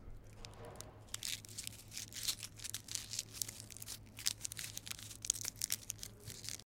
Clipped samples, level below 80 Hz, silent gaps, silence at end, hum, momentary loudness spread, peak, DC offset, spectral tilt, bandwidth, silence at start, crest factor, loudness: under 0.1%; -62 dBFS; none; 0.05 s; none; 13 LU; -8 dBFS; under 0.1%; -0.5 dB/octave; 17 kHz; 0 s; 38 dB; -43 LUFS